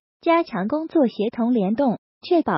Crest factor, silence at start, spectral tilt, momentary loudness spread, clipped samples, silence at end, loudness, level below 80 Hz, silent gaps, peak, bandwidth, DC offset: 14 dB; 0.25 s; -5.5 dB/octave; 4 LU; under 0.1%; 0 s; -22 LUFS; -64 dBFS; 1.98-2.21 s; -8 dBFS; 5.8 kHz; under 0.1%